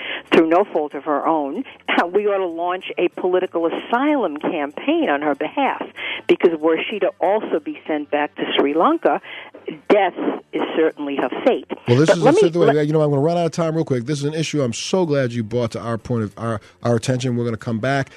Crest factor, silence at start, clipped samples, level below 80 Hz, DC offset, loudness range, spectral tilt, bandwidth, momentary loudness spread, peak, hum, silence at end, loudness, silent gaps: 18 dB; 0 s; under 0.1%; -60 dBFS; under 0.1%; 4 LU; -6 dB/octave; 12 kHz; 9 LU; -2 dBFS; none; 0.1 s; -19 LUFS; none